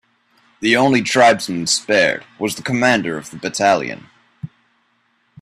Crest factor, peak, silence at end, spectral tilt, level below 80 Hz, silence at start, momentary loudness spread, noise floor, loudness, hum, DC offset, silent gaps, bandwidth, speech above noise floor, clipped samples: 18 dB; 0 dBFS; 0.95 s; -3.5 dB/octave; -58 dBFS; 0.6 s; 22 LU; -63 dBFS; -16 LUFS; none; under 0.1%; none; 15 kHz; 46 dB; under 0.1%